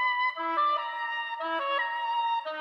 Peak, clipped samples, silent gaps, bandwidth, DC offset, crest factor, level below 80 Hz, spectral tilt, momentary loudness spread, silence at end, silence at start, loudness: -16 dBFS; under 0.1%; none; 6.4 kHz; under 0.1%; 14 dB; under -90 dBFS; -1 dB/octave; 5 LU; 0 s; 0 s; -29 LUFS